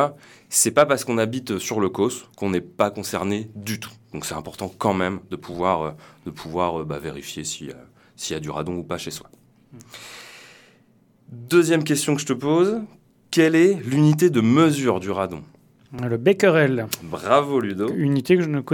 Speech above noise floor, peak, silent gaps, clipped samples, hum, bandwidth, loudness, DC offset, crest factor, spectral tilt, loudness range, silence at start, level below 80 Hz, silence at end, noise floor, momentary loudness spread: 36 dB; -2 dBFS; none; under 0.1%; none; 19 kHz; -22 LUFS; under 0.1%; 20 dB; -5 dB/octave; 12 LU; 0 s; -58 dBFS; 0 s; -58 dBFS; 18 LU